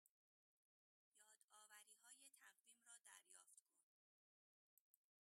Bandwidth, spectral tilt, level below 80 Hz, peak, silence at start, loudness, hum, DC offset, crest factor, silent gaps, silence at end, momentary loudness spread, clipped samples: 16 kHz; 2.5 dB/octave; under -90 dBFS; -48 dBFS; 0.05 s; -67 LUFS; none; under 0.1%; 26 dB; 0.09-1.12 s, 1.44-1.48 s, 3.61-3.66 s, 3.83-4.94 s; 0.4 s; 3 LU; under 0.1%